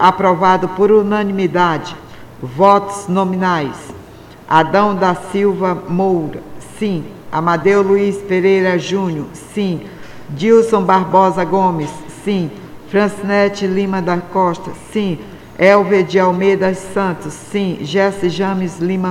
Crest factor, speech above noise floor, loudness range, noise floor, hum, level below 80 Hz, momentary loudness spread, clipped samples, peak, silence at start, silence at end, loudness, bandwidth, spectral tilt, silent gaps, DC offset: 14 dB; 23 dB; 2 LU; -37 dBFS; none; -48 dBFS; 14 LU; under 0.1%; 0 dBFS; 0 s; 0 s; -15 LUFS; 13.5 kHz; -6.5 dB/octave; none; under 0.1%